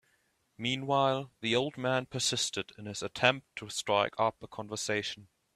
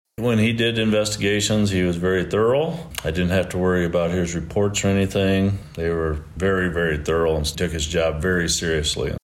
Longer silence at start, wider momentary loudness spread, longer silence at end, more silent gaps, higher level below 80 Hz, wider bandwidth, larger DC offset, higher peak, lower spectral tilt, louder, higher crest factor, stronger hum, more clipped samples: first, 0.6 s vs 0.2 s; first, 11 LU vs 5 LU; first, 0.3 s vs 0.05 s; neither; second, -70 dBFS vs -36 dBFS; about the same, 15 kHz vs 16.5 kHz; neither; about the same, -8 dBFS vs -10 dBFS; second, -3 dB/octave vs -5 dB/octave; second, -31 LUFS vs -21 LUFS; first, 26 dB vs 10 dB; neither; neither